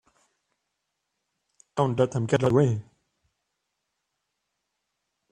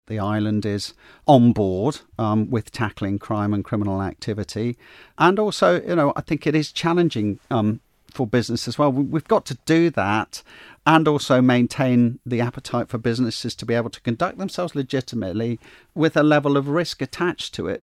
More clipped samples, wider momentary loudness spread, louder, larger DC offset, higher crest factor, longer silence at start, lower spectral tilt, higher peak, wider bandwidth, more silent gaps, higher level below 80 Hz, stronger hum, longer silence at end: neither; about the same, 10 LU vs 10 LU; second, -25 LUFS vs -21 LUFS; neither; about the same, 24 dB vs 20 dB; first, 1.75 s vs 0.1 s; about the same, -7.5 dB/octave vs -6.5 dB/octave; second, -6 dBFS vs -2 dBFS; second, 10 kHz vs 14 kHz; neither; second, -62 dBFS vs -54 dBFS; neither; first, 2.5 s vs 0.05 s